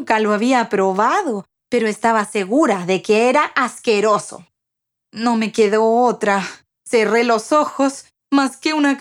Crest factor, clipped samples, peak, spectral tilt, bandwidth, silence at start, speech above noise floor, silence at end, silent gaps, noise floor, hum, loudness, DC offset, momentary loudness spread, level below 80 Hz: 16 dB; under 0.1%; -2 dBFS; -4.5 dB/octave; 13 kHz; 0 s; 64 dB; 0 s; none; -80 dBFS; none; -17 LUFS; under 0.1%; 6 LU; -70 dBFS